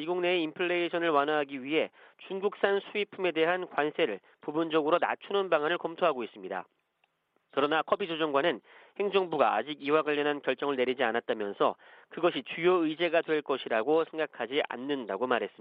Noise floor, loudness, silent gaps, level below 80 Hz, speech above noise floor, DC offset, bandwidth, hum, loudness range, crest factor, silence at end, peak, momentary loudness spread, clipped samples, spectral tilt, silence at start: -75 dBFS; -30 LUFS; none; -80 dBFS; 46 dB; under 0.1%; 5.2 kHz; none; 2 LU; 20 dB; 0.1 s; -10 dBFS; 8 LU; under 0.1%; -8 dB/octave; 0 s